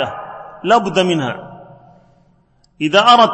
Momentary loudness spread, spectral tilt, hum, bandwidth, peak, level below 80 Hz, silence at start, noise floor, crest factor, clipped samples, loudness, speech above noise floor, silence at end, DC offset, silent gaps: 21 LU; -4.5 dB/octave; none; 8.8 kHz; 0 dBFS; -56 dBFS; 0 s; -55 dBFS; 16 dB; under 0.1%; -14 LUFS; 42 dB; 0 s; under 0.1%; none